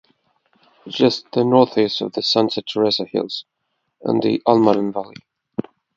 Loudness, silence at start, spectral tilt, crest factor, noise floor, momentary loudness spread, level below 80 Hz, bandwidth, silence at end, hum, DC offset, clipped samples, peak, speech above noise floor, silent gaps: -18 LUFS; 0.85 s; -6 dB/octave; 20 dB; -63 dBFS; 15 LU; -64 dBFS; 7.6 kHz; 0.35 s; none; under 0.1%; under 0.1%; 0 dBFS; 45 dB; none